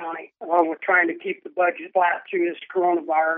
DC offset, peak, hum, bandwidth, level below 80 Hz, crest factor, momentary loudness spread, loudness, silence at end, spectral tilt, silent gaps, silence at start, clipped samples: under 0.1%; -6 dBFS; none; 3.7 kHz; under -90 dBFS; 18 dB; 10 LU; -22 LUFS; 0 s; -7.5 dB/octave; none; 0 s; under 0.1%